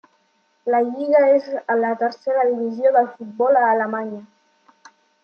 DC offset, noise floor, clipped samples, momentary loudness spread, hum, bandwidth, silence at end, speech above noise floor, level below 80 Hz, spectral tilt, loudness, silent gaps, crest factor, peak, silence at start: under 0.1%; -64 dBFS; under 0.1%; 11 LU; none; 6.6 kHz; 1 s; 45 dB; -80 dBFS; -7 dB/octave; -19 LUFS; none; 16 dB; -4 dBFS; 0.65 s